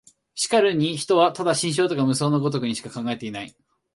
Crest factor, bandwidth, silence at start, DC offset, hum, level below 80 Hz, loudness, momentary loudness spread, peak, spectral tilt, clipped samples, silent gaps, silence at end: 18 dB; 11.5 kHz; 0.35 s; under 0.1%; none; -66 dBFS; -22 LUFS; 13 LU; -4 dBFS; -4.5 dB/octave; under 0.1%; none; 0.45 s